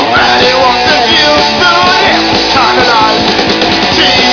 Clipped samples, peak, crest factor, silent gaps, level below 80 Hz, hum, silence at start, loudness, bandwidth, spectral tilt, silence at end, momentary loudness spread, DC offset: 0.3%; 0 dBFS; 8 dB; none; -32 dBFS; none; 0 s; -6 LUFS; 5.4 kHz; -3 dB/octave; 0 s; 3 LU; 0.2%